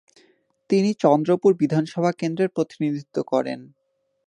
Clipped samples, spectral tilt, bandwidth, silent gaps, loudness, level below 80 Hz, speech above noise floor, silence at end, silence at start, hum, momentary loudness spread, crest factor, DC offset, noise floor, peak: under 0.1%; -7.5 dB/octave; 10.5 kHz; none; -22 LUFS; -72 dBFS; 40 dB; 0.6 s; 0.7 s; none; 8 LU; 20 dB; under 0.1%; -62 dBFS; -4 dBFS